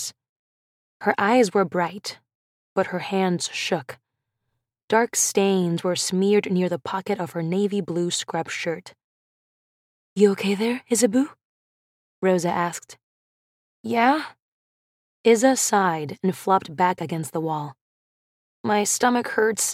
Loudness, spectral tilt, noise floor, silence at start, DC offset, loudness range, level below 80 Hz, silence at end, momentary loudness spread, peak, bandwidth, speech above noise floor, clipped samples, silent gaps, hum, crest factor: -22 LUFS; -4 dB/octave; -79 dBFS; 0 s; under 0.1%; 4 LU; -74 dBFS; 0 s; 10 LU; -4 dBFS; 16 kHz; 57 dB; under 0.1%; 0.29-1.00 s, 2.35-2.76 s, 4.84-4.88 s, 9.04-10.16 s, 11.45-12.22 s, 13.03-13.84 s, 14.40-15.24 s, 17.81-18.64 s; none; 20 dB